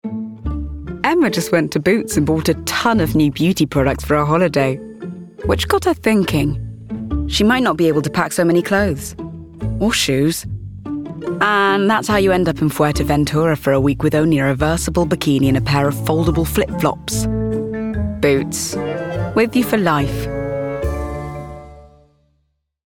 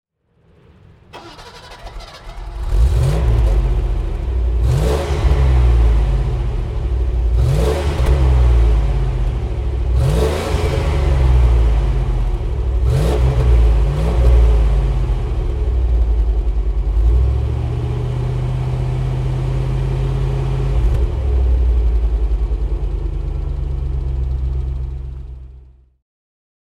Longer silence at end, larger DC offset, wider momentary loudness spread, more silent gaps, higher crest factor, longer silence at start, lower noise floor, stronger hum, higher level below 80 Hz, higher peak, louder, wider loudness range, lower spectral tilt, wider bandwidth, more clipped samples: second, 1.05 s vs 1.2 s; neither; about the same, 12 LU vs 10 LU; neither; about the same, 16 dB vs 14 dB; second, 0.05 s vs 1.15 s; first, -67 dBFS vs -56 dBFS; neither; second, -34 dBFS vs -16 dBFS; about the same, -2 dBFS vs -2 dBFS; about the same, -17 LUFS vs -18 LUFS; about the same, 3 LU vs 5 LU; second, -5.5 dB/octave vs -7.5 dB/octave; first, 19 kHz vs 10 kHz; neither